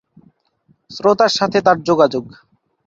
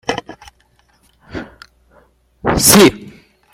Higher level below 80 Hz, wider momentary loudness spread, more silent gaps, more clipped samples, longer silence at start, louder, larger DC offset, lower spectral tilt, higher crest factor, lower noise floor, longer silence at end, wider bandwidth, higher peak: second, -58 dBFS vs -40 dBFS; second, 9 LU vs 24 LU; neither; neither; first, 0.9 s vs 0.1 s; second, -15 LUFS vs -11 LUFS; neither; first, -4.5 dB/octave vs -3 dB/octave; about the same, 16 dB vs 18 dB; about the same, -59 dBFS vs -56 dBFS; first, 0.6 s vs 0.45 s; second, 7.8 kHz vs 16.5 kHz; about the same, -2 dBFS vs 0 dBFS